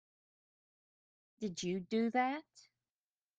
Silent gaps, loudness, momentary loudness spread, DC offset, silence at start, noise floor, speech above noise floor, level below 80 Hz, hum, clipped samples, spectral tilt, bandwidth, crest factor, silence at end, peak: none; -37 LUFS; 11 LU; under 0.1%; 1.4 s; under -90 dBFS; over 53 dB; -80 dBFS; none; under 0.1%; -5 dB/octave; 9.2 kHz; 20 dB; 0.8 s; -20 dBFS